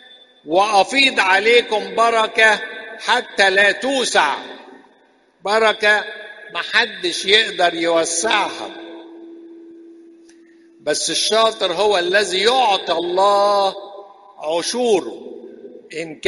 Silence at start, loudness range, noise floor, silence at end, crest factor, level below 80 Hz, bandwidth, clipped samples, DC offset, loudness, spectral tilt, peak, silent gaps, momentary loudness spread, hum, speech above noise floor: 0.45 s; 6 LU; -55 dBFS; 0 s; 18 dB; -62 dBFS; 11.5 kHz; under 0.1%; under 0.1%; -16 LUFS; -1 dB/octave; 0 dBFS; none; 17 LU; none; 38 dB